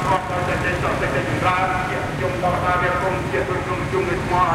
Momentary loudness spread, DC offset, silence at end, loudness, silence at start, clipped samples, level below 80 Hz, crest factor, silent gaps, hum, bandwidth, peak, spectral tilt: 4 LU; under 0.1%; 0 s; -21 LUFS; 0 s; under 0.1%; -36 dBFS; 14 dB; none; none; 16 kHz; -6 dBFS; -6 dB/octave